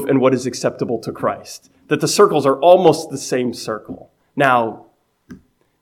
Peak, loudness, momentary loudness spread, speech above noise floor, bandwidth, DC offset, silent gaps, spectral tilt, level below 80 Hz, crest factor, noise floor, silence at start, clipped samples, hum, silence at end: 0 dBFS; -17 LUFS; 19 LU; 27 dB; 16 kHz; under 0.1%; none; -5 dB/octave; -62 dBFS; 18 dB; -43 dBFS; 0 s; under 0.1%; none; 0.45 s